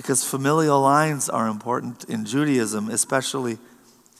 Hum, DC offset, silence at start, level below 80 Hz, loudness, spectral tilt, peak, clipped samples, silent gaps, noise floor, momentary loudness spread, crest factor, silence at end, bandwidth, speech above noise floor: none; under 0.1%; 0 s; -76 dBFS; -22 LUFS; -4 dB/octave; -4 dBFS; under 0.1%; none; -53 dBFS; 11 LU; 18 dB; 0.6 s; 15 kHz; 31 dB